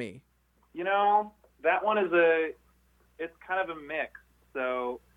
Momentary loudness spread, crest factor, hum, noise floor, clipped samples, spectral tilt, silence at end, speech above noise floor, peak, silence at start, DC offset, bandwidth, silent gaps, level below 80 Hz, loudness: 17 LU; 18 dB; none; -65 dBFS; under 0.1%; -6 dB/octave; 0.2 s; 37 dB; -12 dBFS; 0 s; under 0.1%; 10 kHz; none; -68 dBFS; -28 LUFS